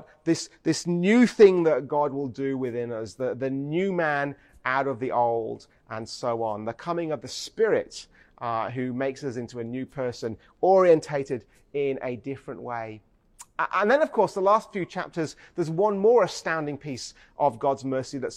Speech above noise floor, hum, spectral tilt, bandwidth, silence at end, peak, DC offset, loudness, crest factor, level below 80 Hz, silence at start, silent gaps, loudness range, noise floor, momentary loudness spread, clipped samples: 27 dB; none; -5.5 dB/octave; 12 kHz; 0 s; -4 dBFS; under 0.1%; -26 LUFS; 20 dB; -64 dBFS; 0.25 s; none; 6 LU; -52 dBFS; 15 LU; under 0.1%